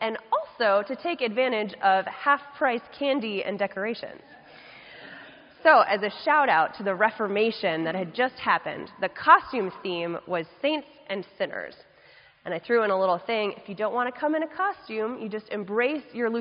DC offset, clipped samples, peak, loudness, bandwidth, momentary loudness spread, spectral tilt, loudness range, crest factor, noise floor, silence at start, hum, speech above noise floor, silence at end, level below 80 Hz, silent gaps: under 0.1%; under 0.1%; -2 dBFS; -25 LUFS; 5.4 kHz; 15 LU; -2 dB/octave; 5 LU; 24 dB; -55 dBFS; 0 s; none; 29 dB; 0 s; -72 dBFS; none